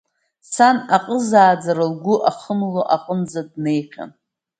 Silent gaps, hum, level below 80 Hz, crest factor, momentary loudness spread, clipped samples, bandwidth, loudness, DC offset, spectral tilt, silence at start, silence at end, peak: none; none; -68 dBFS; 18 dB; 14 LU; under 0.1%; 9.4 kHz; -18 LUFS; under 0.1%; -5.5 dB/octave; 0.5 s; 0.5 s; 0 dBFS